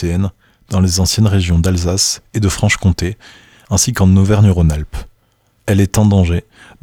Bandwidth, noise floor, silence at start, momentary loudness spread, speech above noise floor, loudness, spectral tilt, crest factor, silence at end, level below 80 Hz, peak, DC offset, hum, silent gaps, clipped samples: 16.5 kHz; -57 dBFS; 0 s; 12 LU; 44 dB; -14 LUFS; -5 dB/octave; 12 dB; 0.4 s; -30 dBFS; -2 dBFS; under 0.1%; none; none; under 0.1%